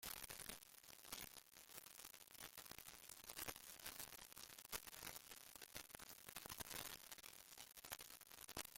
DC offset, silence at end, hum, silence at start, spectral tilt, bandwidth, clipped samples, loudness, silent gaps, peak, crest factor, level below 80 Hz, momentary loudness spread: under 0.1%; 0 s; none; 0 s; -1 dB/octave; 17 kHz; under 0.1%; -55 LUFS; none; -26 dBFS; 32 dB; -76 dBFS; 7 LU